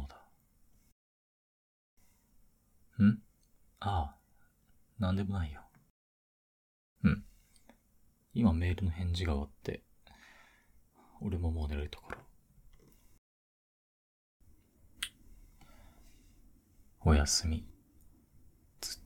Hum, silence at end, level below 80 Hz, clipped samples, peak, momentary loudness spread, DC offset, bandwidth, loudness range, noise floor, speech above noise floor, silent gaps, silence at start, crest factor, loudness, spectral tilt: none; 0.05 s; -46 dBFS; under 0.1%; -16 dBFS; 15 LU; under 0.1%; 15.5 kHz; 15 LU; -68 dBFS; 35 dB; 0.92-1.97 s, 5.90-6.96 s, 13.18-14.40 s; 0 s; 22 dB; -34 LUFS; -5.5 dB/octave